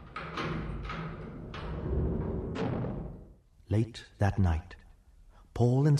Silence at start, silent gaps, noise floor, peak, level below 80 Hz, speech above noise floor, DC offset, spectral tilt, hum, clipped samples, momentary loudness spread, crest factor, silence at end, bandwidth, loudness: 0 s; none; -57 dBFS; -12 dBFS; -42 dBFS; 29 dB; under 0.1%; -8 dB/octave; none; under 0.1%; 15 LU; 20 dB; 0 s; 10.5 kHz; -33 LUFS